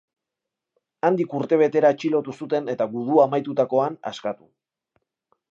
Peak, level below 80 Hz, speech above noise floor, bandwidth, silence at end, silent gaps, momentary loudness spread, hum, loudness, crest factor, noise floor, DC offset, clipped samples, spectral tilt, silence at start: -4 dBFS; -78 dBFS; 64 dB; 7.6 kHz; 1.2 s; none; 12 LU; none; -22 LUFS; 18 dB; -85 dBFS; under 0.1%; under 0.1%; -7 dB/octave; 1.05 s